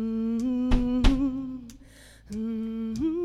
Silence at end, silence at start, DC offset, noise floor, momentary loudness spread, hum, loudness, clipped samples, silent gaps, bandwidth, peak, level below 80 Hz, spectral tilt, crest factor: 0 s; 0 s; under 0.1%; -51 dBFS; 14 LU; none; -28 LUFS; under 0.1%; none; 10.5 kHz; -8 dBFS; -30 dBFS; -7 dB/octave; 18 dB